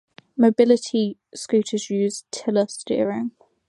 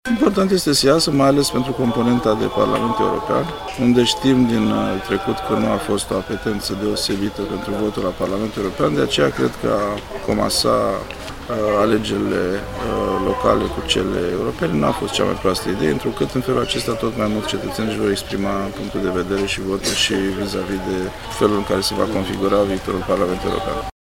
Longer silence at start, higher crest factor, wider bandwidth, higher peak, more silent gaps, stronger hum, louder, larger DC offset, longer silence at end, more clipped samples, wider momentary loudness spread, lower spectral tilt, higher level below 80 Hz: first, 0.35 s vs 0.05 s; about the same, 18 dB vs 18 dB; second, 11.5 kHz vs 16.5 kHz; about the same, -4 dBFS vs -2 dBFS; neither; neither; second, -22 LUFS vs -19 LUFS; neither; first, 0.4 s vs 0.15 s; neither; first, 12 LU vs 8 LU; about the same, -5 dB/octave vs -5 dB/octave; second, -70 dBFS vs -38 dBFS